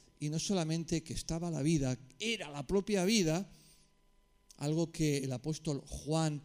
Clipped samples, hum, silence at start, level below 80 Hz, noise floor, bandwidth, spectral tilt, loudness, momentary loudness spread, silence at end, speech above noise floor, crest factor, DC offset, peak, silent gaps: under 0.1%; none; 0.2 s; -54 dBFS; -68 dBFS; 15.5 kHz; -5 dB/octave; -35 LUFS; 8 LU; 0.05 s; 34 dB; 20 dB; under 0.1%; -14 dBFS; none